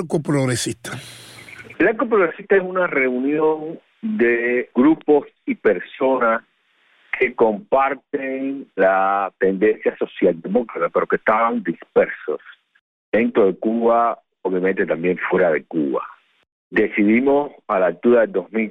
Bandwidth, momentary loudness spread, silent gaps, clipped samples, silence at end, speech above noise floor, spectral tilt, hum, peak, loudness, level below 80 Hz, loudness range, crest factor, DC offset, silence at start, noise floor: 13.5 kHz; 11 LU; 12.81-13.12 s, 16.52-16.71 s; under 0.1%; 0 s; 41 dB; -6 dB/octave; none; -4 dBFS; -19 LUFS; -58 dBFS; 2 LU; 16 dB; under 0.1%; 0 s; -60 dBFS